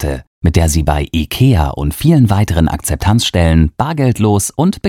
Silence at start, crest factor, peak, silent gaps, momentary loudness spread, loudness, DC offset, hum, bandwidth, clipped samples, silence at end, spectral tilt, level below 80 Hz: 0 s; 12 dB; 0 dBFS; 0.27-0.41 s; 5 LU; -13 LUFS; under 0.1%; none; 17 kHz; under 0.1%; 0 s; -6 dB/octave; -24 dBFS